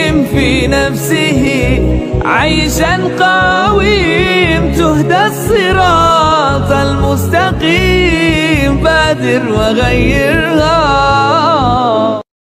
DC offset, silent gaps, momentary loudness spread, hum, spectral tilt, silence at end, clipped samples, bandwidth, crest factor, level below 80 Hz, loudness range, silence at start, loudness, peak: under 0.1%; none; 3 LU; none; -5 dB/octave; 0.25 s; under 0.1%; 16 kHz; 10 dB; -22 dBFS; 1 LU; 0 s; -10 LUFS; 0 dBFS